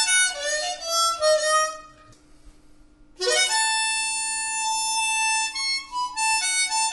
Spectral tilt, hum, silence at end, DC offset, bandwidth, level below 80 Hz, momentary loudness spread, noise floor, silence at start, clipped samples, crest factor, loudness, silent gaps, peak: 2.5 dB/octave; none; 0 s; under 0.1%; 11.5 kHz; -58 dBFS; 6 LU; -51 dBFS; 0 s; under 0.1%; 16 dB; -22 LUFS; none; -8 dBFS